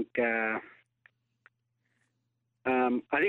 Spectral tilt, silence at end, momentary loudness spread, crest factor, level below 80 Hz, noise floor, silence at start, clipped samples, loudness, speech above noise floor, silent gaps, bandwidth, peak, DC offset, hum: -7.5 dB/octave; 0 s; 9 LU; 18 dB; -76 dBFS; -80 dBFS; 0 s; under 0.1%; -30 LUFS; 50 dB; none; 4.2 kHz; -14 dBFS; under 0.1%; none